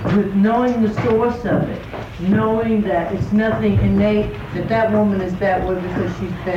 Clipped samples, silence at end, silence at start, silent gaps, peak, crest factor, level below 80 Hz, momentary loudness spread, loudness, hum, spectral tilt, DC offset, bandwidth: under 0.1%; 0 s; 0 s; none; -6 dBFS; 12 dB; -36 dBFS; 8 LU; -18 LUFS; none; -8.5 dB/octave; under 0.1%; 7.2 kHz